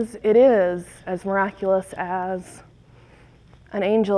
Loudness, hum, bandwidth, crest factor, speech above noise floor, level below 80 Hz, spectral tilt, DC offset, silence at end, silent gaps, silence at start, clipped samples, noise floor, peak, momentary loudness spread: -22 LUFS; none; 11 kHz; 16 dB; 29 dB; -56 dBFS; -6.5 dB/octave; under 0.1%; 0 s; none; 0 s; under 0.1%; -50 dBFS; -6 dBFS; 16 LU